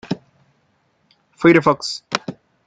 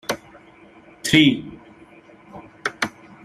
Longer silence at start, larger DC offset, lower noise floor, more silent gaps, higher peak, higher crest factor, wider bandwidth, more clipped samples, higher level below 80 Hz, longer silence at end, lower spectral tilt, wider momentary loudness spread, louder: about the same, 0.1 s vs 0.1 s; neither; first, -63 dBFS vs -48 dBFS; neither; about the same, 0 dBFS vs -2 dBFS; about the same, 20 dB vs 22 dB; second, 9.2 kHz vs 14.5 kHz; neither; about the same, -58 dBFS vs -56 dBFS; about the same, 0.35 s vs 0.35 s; first, -5.5 dB/octave vs -4 dB/octave; second, 17 LU vs 27 LU; about the same, -18 LUFS vs -20 LUFS